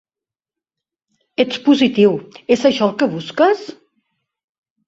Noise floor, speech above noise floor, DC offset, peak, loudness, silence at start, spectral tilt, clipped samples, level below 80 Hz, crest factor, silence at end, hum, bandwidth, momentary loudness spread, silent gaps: -89 dBFS; 74 dB; under 0.1%; -2 dBFS; -16 LUFS; 1.4 s; -5.5 dB/octave; under 0.1%; -60 dBFS; 18 dB; 1.15 s; none; 8 kHz; 11 LU; none